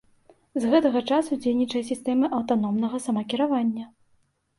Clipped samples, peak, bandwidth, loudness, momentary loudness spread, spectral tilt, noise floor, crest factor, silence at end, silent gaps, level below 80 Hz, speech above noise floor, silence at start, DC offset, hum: under 0.1%; -8 dBFS; 11.5 kHz; -24 LUFS; 7 LU; -5.5 dB/octave; -66 dBFS; 16 dB; 0.7 s; none; -66 dBFS; 43 dB; 0.55 s; under 0.1%; none